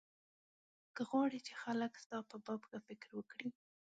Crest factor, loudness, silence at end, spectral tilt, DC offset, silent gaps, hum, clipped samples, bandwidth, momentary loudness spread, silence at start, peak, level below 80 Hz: 20 dB; -44 LUFS; 0.45 s; -5 dB/octave; under 0.1%; 2.06-2.10 s; none; under 0.1%; 9 kHz; 14 LU; 0.95 s; -24 dBFS; -90 dBFS